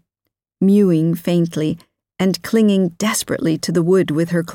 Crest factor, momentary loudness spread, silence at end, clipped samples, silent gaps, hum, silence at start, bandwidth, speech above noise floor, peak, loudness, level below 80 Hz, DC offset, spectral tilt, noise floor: 12 dB; 6 LU; 0 s; under 0.1%; none; none; 0.6 s; 17 kHz; 61 dB; -4 dBFS; -17 LUFS; -56 dBFS; under 0.1%; -6 dB/octave; -78 dBFS